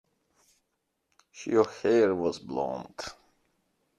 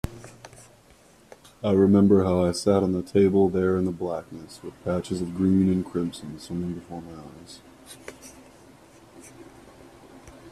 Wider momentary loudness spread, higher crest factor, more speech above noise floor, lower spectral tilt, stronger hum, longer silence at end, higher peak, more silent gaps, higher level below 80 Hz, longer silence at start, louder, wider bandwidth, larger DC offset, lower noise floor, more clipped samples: second, 17 LU vs 25 LU; about the same, 22 dB vs 18 dB; first, 52 dB vs 32 dB; second, -5.5 dB/octave vs -7.5 dB/octave; neither; first, 0.85 s vs 0 s; about the same, -8 dBFS vs -6 dBFS; neither; second, -68 dBFS vs -54 dBFS; first, 1.35 s vs 0.05 s; second, -27 LUFS vs -23 LUFS; second, 10.5 kHz vs 13 kHz; neither; first, -80 dBFS vs -55 dBFS; neither